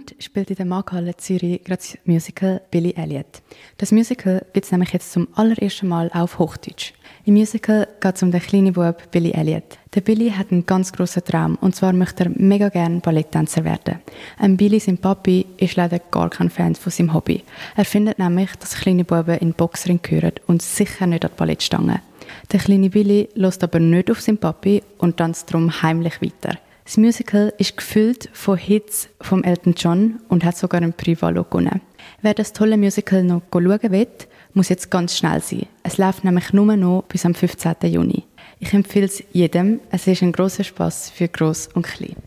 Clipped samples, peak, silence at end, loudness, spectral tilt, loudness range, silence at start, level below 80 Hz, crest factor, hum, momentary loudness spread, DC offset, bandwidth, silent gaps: under 0.1%; -4 dBFS; 0.15 s; -19 LUFS; -6.5 dB/octave; 2 LU; 0 s; -48 dBFS; 14 dB; none; 9 LU; under 0.1%; 15.5 kHz; none